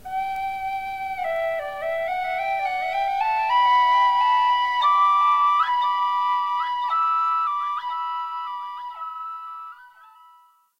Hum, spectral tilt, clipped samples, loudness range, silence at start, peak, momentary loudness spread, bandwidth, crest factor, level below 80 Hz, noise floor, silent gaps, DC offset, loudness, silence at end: none; -1 dB/octave; under 0.1%; 8 LU; 0.05 s; -10 dBFS; 15 LU; 16 kHz; 12 dB; -60 dBFS; -56 dBFS; none; under 0.1%; -22 LUFS; 0.9 s